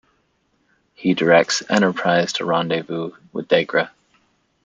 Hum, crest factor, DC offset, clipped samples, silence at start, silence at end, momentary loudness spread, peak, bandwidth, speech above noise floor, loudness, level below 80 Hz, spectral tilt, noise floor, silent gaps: none; 20 dB; under 0.1%; under 0.1%; 1 s; 0.75 s; 13 LU; -2 dBFS; 9.4 kHz; 47 dB; -19 LUFS; -66 dBFS; -4.5 dB/octave; -65 dBFS; none